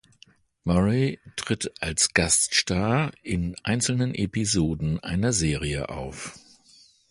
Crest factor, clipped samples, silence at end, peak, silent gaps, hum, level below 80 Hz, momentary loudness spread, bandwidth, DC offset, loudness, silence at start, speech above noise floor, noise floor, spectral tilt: 20 dB; under 0.1%; 0.7 s; -6 dBFS; none; none; -42 dBFS; 14 LU; 11.5 kHz; under 0.1%; -24 LUFS; 0.65 s; 33 dB; -58 dBFS; -4 dB/octave